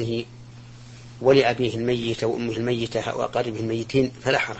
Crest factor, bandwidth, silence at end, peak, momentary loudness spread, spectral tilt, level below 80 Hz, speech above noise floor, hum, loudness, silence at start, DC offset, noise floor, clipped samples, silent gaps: 18 dB; 8.6 kHz; 0 s; -6 dBFS; 25 LU; -6 dB/octave; -52 dBFS; 20 dB; none; -24 LUFS; 0 s; under 0.1%; -43 dBFS; under 0.1%; none